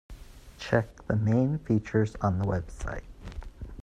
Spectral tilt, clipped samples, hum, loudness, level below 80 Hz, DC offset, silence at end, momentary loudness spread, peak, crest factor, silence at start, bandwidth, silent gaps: -8 dB/octave; under 0.1%; none; -29 LUFS; -44 dBFS; under 0.1%; 0 s; 18 LU; -8 dBFS; 22 dB; 0.1 s; 9.8 kHz; none